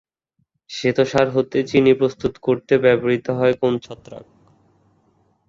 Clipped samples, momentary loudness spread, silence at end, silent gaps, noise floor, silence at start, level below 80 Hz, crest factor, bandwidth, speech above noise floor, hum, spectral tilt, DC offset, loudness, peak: under 0.1%; 10 LU; 1.3 s; none; -70 dBFS; 0.7 s; -54 dBFS; 18 dB; 7.6 kHz; 52 dB; none; -6.5 dB/octave; under 0.1%; -19 LUFS; -2 dBFS